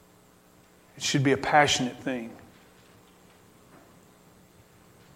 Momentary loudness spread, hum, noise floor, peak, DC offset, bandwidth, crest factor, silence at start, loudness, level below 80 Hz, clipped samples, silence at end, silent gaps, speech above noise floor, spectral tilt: 14 LU; none; -58 dBFS; -6 dBFS; under 0.1%; 16 kHz; 26 dB; 0.95 s; -25 LUFS; -62 dBFS; under 0.1%; 2.8 s; none; 33 dB; -3.5 dB/octave